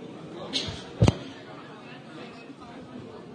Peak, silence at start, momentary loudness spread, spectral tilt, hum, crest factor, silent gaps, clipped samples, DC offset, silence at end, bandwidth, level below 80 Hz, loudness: -4 dBFS; 0 s; 19 LU; -5.5 dB/octave; none; 28 dB; none; under 0.1%; under 0.1%; 0 s; 10.5 kHz; -46 dBFS; -29 LUFS